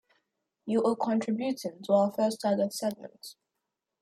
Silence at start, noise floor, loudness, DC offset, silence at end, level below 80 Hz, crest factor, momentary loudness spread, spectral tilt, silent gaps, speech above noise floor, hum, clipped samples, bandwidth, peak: 0.65 s; -85 dBFS; -29 LUFS; under 0.1%; 0.7 s; -78 dBFS; 18 dB; 19 LU; -5.5 dB/octave; none; 57 dB; none; under 0.1%; 15 kHz; -12 dBFS